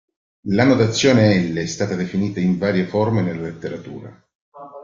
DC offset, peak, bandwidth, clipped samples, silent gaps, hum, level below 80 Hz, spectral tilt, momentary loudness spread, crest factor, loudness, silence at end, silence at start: under 0.1%; -2 dBFS; 7.6 kHz; under 0.1%; 4.35-4.52 s; none; -52 dBFS; -6 dB/octave; 18 LU; 18 dB; -18 LUFS; 0 s; 0.45 s